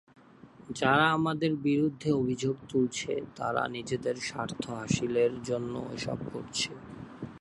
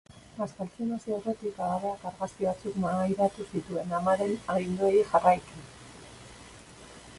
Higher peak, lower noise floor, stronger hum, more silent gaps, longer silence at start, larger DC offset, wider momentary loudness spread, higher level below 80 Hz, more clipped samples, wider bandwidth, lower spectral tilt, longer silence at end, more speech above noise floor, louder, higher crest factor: about the same, -10 dBFS vs -8 dBFS; first, -54 dBFS vs -50 dBFS; neither; neither; first, 0.45 s vs 0.1 s; neither; second, 10 LU vs 24 LU; about the same, -62 dBFS vs -60 dBFS; neither; about the same, 11.5 kHz vs 11.5 kHz; second, -5 dB/octave vs -6.5 dB/octave; about the same, 0 s vs 0 s; about the same, 24 dB vs 21 dB; about the same, -30 LUFS vs -29 LUFS; about the same, 22 dB vs 22 dB